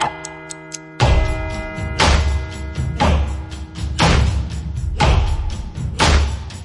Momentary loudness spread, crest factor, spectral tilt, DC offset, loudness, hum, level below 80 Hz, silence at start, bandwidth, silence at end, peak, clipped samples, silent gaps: 15 LU; 16 dB; -5 dB/octave; under 0.1%; -19 LUFS; none; -22 dBFS; 0 s; 11.5 kHz; 0 s; -2 dBFS; under 0.1%; none